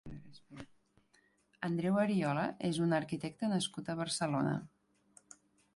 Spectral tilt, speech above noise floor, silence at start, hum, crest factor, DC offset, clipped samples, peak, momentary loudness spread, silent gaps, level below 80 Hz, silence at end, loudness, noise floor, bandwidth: -5.5 dB/octave; 38 dB; 0.05 s; none; 18 dB; under 0.1%; under 0.1%; -20 dBFS; 21 LU; none; -68 dBFS; 1.1 s; -35 LUFS; -72 dBFS; 11.5 kHz